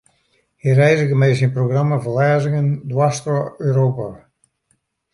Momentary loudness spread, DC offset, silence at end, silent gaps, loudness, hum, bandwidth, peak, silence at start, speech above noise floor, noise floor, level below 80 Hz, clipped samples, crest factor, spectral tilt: 7 LU; under 0.1%; 0.95 s; none; -17 LUFS; none; 11 kHz; -2 dBFS; 0.65 s; 50 dB; -66 dBFS; -56 dBFS; under 0.1%; 16 dB; -7 dB/octave